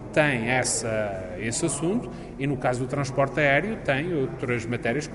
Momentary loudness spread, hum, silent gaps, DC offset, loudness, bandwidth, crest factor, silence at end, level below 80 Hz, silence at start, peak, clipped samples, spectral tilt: 8 LU; none; none; under 0.1%; -25 LUFS; 11.5 kHz; 20 dB; 0 s; -48 dBFS; 0 s; -6 dBFS; under 0.1%; -4.5 dB/octave